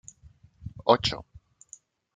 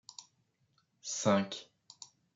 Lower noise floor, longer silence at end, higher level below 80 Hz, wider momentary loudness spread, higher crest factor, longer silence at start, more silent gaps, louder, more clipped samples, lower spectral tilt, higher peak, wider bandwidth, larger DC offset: second, -56 dBFS vs -76 dBFS; first, 0.95 s vs 0.3 s; first, -54 dBFS vs -86 dBFS; first, 26 LU vs 22 LU; about the same, 28 dB vs 24 dB; first, 0.65 s vs 0.2 s; neither; first, -25 LUFS vs -33 LUFS; neither; about the same, -4.5 dB/octave vs -4.5 dB/octave; first, -4 dBFS vs -14 dBFS; first, 9.4 kHz vs 8 kHz; neither